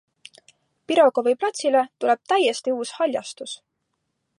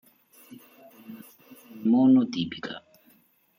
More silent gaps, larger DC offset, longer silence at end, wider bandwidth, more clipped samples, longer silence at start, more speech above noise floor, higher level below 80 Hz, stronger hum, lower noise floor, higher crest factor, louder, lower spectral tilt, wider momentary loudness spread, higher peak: neither; neither; about the same, 0.85 s vs 0.8 s; second, 11.5 kHz vs 16 kHz; neither; second, 0.9 s vs 1.1 s; first, 55 dB vs 40 dB; second, -80 dBFS vs -72 dBFS; neither; first, -76 dBFS vs -62 dBFS; about the same, 18 dB vs 16 dB; about the same, -21 LUFS vs -23 LUFS; second, -2 dB/octave vs -6.5 dB/octave; second, 16 LU vs 26 LU; first, -6 dBFS vs -12 dBFS